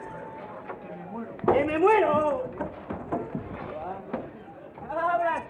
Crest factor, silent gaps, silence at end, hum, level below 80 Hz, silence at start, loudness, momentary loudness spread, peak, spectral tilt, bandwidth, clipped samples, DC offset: 20 dB; none; 0 s; none; -56 dBFS; 0 s; -27 LUFS; 18 LU; -10 dBFS; -7.5 dB/octave; 10 kHz; under 0.1%; under 0.1%